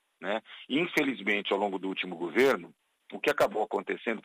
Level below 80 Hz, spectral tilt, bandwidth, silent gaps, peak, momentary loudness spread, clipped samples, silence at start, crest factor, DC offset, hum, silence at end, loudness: -72 dBFS; -4.5 dB/octave; 15.5 kHz; none; -12 dBFS; 9 LU; under 0.1%; 0.2 s; 18 dB; under 0.1%; none; 0.05 s; -30 LUFS